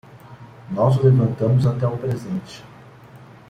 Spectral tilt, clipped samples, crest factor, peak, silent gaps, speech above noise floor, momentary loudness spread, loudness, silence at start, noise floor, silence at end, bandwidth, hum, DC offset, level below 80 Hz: -9 dB/octave; under 0.1%; 18 dB; -4 dBFS; none; 25 dB; 15 LU; -20 LUFS; 0.15 s; -44 dBFS; 0.35 s; 8 kHz; none; under 0.1%; -52 dBFS